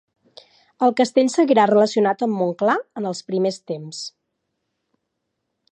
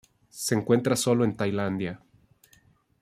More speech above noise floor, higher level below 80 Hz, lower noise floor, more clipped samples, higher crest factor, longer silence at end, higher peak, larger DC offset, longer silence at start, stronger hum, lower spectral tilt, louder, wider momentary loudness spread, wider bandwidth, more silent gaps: first, 58 dB vs 37 dB; second, -78 dBFS vs -64 dBFS; first, -77 dBFS vs -62 dBFS; neither; about the same, 18 dB vs 20 dB; first, 1.6 s vs 1.05 s; first, -4 dBFS vs -8 dBFS; neither; first, 0.8 s vs 0.35 s; neither; about the same, -5 dB/octave vs -5 dB/octave; first, -19 LUFS vs -26 LUFS; about the same, 15 LU vs 13 LU; second, 10 kHz vs 15.5 kHz; neither